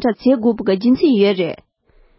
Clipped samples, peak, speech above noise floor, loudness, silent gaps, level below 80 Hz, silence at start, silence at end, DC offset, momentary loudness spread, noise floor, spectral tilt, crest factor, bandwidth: under 0.1%; -2 dBFS; 38 dB; -16 LUFS; none; -52 dBFS; 0 s; 0.65 s; under 0.1%; 9 LU; -53 dBFS; -11 dB/octave; 14 dB; 5.8 kHz